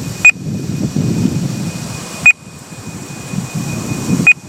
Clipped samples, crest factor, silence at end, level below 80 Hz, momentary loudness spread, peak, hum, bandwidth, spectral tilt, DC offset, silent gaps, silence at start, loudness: under 0.1%; 16 dB; 0 s; -44 dBFS; 19 LU; 0 dBFS; none; 16.5 kHz; -4.5 dB/octave; under 0.1%; none; 0 s; -14 LUFS